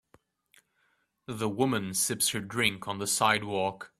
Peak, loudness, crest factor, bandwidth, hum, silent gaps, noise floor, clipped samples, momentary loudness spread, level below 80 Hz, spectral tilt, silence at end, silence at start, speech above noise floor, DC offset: -8 dBFS; -28 LUFS; 24 dB; 15.5 kHz; none; none; -73 dBFS; under 0.1%; 8 LU; -66 dBFS; -3 dB/octave; 0.15 s; 1.3 s; 44 dB; under 0.1%